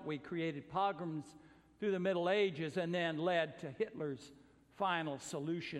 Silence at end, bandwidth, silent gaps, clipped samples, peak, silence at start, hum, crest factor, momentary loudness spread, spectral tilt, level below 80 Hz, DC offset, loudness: 0 s; 12.5 kHz; none; under 0.1%; -20 dBFS; 0 s; none; 18 dB; 10 LU; -5.5 dB/octave; -76 dBFS; under 0.1%; -38 LUFS